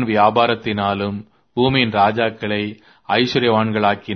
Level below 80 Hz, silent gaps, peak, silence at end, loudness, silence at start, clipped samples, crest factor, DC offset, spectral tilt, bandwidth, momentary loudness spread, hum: -52 dBFS; none; 0 dBFS; 0 s; -18 LUFS; 0 s; under 0.1%; 18 dB; under 0.1%; -7 dB/octave; 6.4 kHz; 10 LU; none